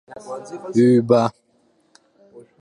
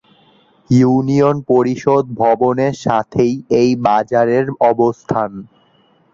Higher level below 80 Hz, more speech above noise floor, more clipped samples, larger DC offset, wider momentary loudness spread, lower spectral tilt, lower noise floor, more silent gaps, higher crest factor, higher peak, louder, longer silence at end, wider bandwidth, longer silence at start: second, -64 dBFS vs -52 dBFS; first, 44 dB vs 40 dB; neither; neither; first, 19 LU vs 5 LU; about the same, -7.5 dB/octave vs -7.5 dB/octave; first, -62 dBFS vs -54 dBFS; neither; about the same, 18 dB vs 14 dB; about the same, -2 dBFS vs -2 dBFS; about the same, -17 LUFS vs -15 LUFS; second, 0.2 s vs 0.7 s; first, 10.5 kHz vs 7.6 kHz; second, 0.1 s vs 0.7 s